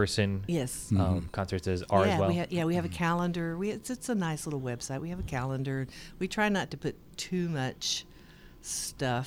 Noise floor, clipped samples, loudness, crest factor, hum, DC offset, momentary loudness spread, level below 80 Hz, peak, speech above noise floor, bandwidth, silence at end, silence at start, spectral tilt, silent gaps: -52 dBFS; under 0.1%; -31 LUFS; 18 dB; none; under 0.1%; 8 LU; -50 dBFS; -12 dBFS; 22 dB; 16.5 kHz; 0 s; 0 s; -5 dB/octave; none